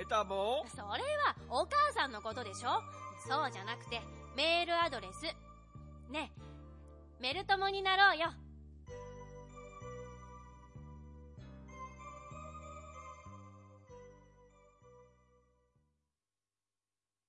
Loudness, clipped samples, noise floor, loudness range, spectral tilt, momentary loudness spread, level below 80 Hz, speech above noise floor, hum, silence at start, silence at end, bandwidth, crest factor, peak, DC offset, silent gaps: -35 LUFS; under 0.1%; under -90 dBFS; 18 LU; -3.5 dB/octave; 24 LU; -60 dBFS; over 55 dB; none; 0 s; 2.25 s; 11.5 kHz; 24 dB; -16 dBFS; under 0.1%; none